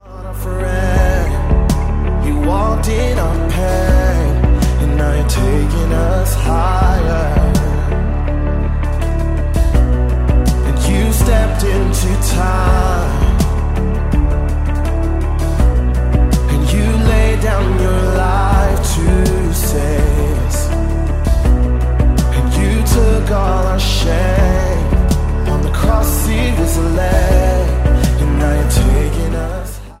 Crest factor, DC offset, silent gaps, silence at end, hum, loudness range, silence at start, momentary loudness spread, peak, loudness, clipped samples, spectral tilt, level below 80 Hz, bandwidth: 12 dB; under 0.1%; none; 0.05 s; none; 2 LU; 0.05 s; 4 LU; 0 dBFS; -15 LUFS; under 0.1%; -6 dB/octave; -14 dBFS; 16 kHz